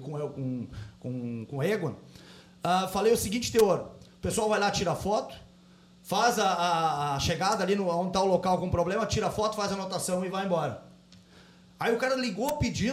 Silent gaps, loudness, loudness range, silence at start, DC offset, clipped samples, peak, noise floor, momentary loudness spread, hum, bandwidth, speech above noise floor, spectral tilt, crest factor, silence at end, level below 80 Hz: none; -28 LUFS; 4 LU; 0 s; under 0.1%; under 0.1%; -12 dBFS; -56 dBFS; 11 LU; none; 16 kHz; 28 dB; -4.5 dB/octave; 18 dB; 0 s; -52 dBFS